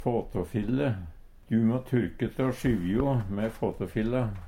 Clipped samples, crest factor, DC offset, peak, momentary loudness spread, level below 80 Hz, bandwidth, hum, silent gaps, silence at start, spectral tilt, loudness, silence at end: under 0.1%; 16 dB; under 0.1%; -14 dBFS; 6 LU; -44 dBFS; 16 kHz; none; none; 0 s; -8.5 dB/octave; -29 LUFS; 0 s